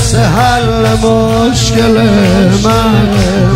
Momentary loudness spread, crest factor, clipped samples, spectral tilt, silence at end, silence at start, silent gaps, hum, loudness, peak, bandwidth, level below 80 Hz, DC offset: 2 LU; 8 dB; under 0.1%; -5.5 dB/octave; 0 s; 0 s; none; none; -9 LUFS; 0 dBFS; 16 kHz; -22 dBFS; under 0.1%